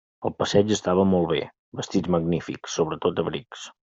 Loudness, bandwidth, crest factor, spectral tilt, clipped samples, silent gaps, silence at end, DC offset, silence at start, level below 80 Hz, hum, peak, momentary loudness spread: -24 LUFS; 7.8 kHz; 20 dB; -5.5 dB/octave; under 0.1%; 1.59-1.72 s; 0.15 s; under 0.1%; 0.2 s; -56 dBFS; none; -4 dBFS; 13 LU